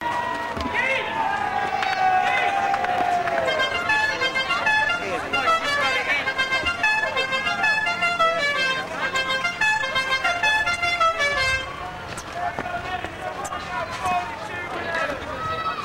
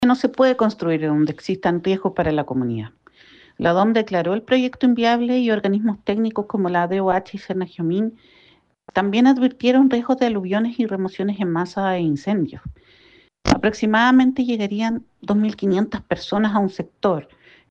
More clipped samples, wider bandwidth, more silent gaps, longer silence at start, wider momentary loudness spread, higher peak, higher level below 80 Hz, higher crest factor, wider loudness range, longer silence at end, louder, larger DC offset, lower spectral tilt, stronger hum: neither; first, 16 kHz vs 7.8 kHz; neither; about the same, 0 s vs 0 s; about the same, 9 LU vs 9 LU; second, -10 dBFS vs -6 dBFS; about the same, -48 dBFS vs -48 dBFS; about the same, 14 dB vs 14 dB; first, 7 LU vs 3 LU; second, 0 s vs 0.5 s; about the same, -22 LUFS vs -20 LUFS; neither; second, -2.5 dB/octave vs -6.5 dB/octave; neither